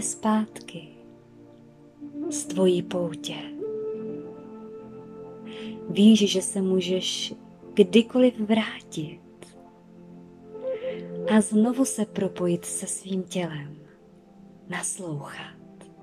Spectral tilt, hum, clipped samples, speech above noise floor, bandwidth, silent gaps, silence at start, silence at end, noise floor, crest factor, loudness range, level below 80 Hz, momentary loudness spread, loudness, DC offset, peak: -4.5 dB/octave; none; under 0.1%; 28 dB; 14.5 kHz; none; 0 s; 0.1 s; -52 dBFS; 22 dB; 8 LU; -70 dBFS; 22 LU; -25 LUFS; under 0.1%; -4 dBFS